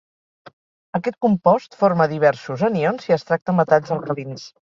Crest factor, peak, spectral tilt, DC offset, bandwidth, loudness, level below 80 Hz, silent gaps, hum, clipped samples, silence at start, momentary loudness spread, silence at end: 18 dB; -2 dBFS; -7.5 dB/octave; under 0.1%; 7.4 kHz; -20 LUFS; -62 dBFS; 3.42-3.46 s; none; under 0.1%; 0.95 s; 9 LU; 0.2 s